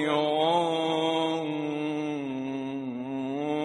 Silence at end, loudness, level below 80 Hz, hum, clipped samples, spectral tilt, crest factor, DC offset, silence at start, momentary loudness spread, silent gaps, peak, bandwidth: 0 s; -29 LUFS; -74 dBFS; none; under 0.1%; -5.5 dB/octave; 16 dB; under 0.1%; 0 s; 9 LU; none; -12 dBFS; 11 kHz